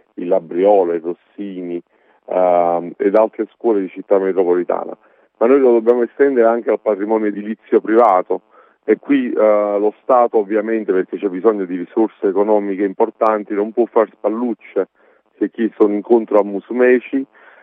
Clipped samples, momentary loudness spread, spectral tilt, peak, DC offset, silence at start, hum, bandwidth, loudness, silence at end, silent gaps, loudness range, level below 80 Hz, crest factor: under 0.1%; 10 LU; -9.5 dB/octave; 0 dBFS; under 0.1%; 0.2 s; none; 4.5 kHz; -16 LUFS; 0.4 s; none; 3 LU; -74 dBFS; 16 dB